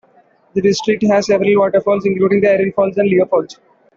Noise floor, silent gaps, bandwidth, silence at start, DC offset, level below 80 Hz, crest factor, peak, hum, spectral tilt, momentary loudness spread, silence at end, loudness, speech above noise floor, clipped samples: -52 dBFS; none; 7.6 kHz; 0.55 s; under 0.1%; -54 dBFS; 12 dB; -2 dBFS; none; -6 dB/octave; 5 LU; 0.45 s; -14 LUFS; 38 dB; under 0.1%